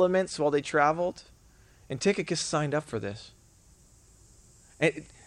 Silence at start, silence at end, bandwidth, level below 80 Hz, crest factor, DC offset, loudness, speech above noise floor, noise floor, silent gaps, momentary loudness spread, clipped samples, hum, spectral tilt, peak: 0 s; 0.2 s; 11.5 kHz; -60 dBFS; 20 dB; under 0.1%; -28 LUFS; 30 dB; -58 dBFS; none; 14 LU; under 0.1%; none; -4.5 dB/octave; -10 dBFS